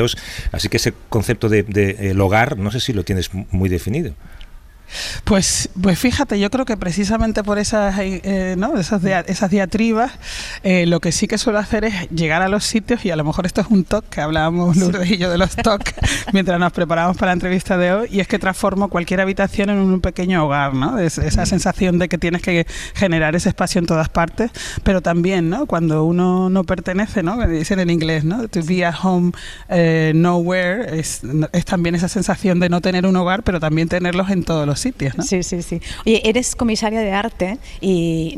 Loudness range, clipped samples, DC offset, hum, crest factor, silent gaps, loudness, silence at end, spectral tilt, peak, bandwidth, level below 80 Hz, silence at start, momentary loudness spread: 2 LU; under 0.1%; under 0.1%; none; 14 dB; none; -18 LUFS; 0 s; -5.5 dB/octave; -4 dBFS; 15 kHz; -32 dBFS; 0 s; 6 LU